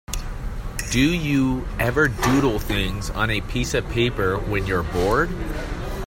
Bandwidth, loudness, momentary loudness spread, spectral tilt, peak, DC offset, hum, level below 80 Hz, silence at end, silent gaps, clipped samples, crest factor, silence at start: 16.5 kHz; -22 LUFS; 11 LU; -5 dB/octave; -6 dBFS; under 0.1%; none; -30 dBFS; 0 s; none; under 0.1%; 16 dB; 0.1 s